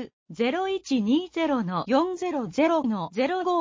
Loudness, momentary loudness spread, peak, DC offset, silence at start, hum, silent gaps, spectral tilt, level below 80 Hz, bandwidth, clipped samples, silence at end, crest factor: -26 LUFS; 5 LU; -10 dBFS; under 0.1%; 0 s; none; 0.13-0.26 s; -6 dB/octave; -64 dBFS; 7.6 kHz; under 0.1%; 0 s; 14 dB